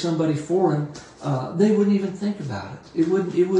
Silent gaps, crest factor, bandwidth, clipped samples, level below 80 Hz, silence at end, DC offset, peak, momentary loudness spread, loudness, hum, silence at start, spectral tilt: none; 16 dB; 10 kHz; under 0.1%; -62 dBFS; 0 s; under 0.1%; -6 dBFS; 12 LU; -23 LUFS; none; 0 s; -7.5 dB/octave